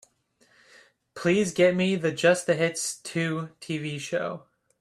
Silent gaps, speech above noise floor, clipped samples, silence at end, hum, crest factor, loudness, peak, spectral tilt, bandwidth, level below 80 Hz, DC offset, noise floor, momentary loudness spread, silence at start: none; 40 dB; under 0.1%; 0.4 s; none; 20 dB; -26 LUFS; -8 dBFS; -4.5 dB/octave; 13.5 kHz; -66 dBFS; under 0.1%; -65 dBFS; 12 LU; 1.15 s